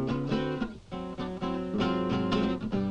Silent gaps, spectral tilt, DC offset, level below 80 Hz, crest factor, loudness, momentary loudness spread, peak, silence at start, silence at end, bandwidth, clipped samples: none; -7.5 dB/octave; under 0.1%; -48 dBFS; 14 dB; -31 LUFS; 8 LU; -16 dBFS; 0 s; 0 s; 9 kHz; under 0.1%